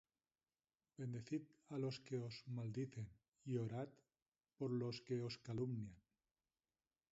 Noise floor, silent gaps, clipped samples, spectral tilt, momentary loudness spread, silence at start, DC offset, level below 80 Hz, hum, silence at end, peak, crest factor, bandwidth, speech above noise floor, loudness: under -90 dBFS; 4.22-4.26 s; under 0.1%; -7 dB/octave; 10 LU; 1 s; under 0.1%; -80 dBFS; none; 1.15 s; -32 dBFS; 18 dB; 7.6 kHz; over 43 dB; -48 LUFS